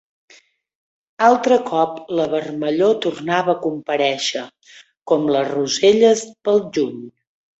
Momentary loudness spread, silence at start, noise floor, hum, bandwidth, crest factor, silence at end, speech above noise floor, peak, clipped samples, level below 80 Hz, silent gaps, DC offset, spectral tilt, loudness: 8 LU; 1.2 s; -52 dBFS; none; 8.2 kHz; 18 dB; 0.5 s; 35 dB; -2 dBFS; under 0.1%; -64 dBFS; 5.02-5.06 s; under 0.1%; -4 dB/octave; -18 LUFS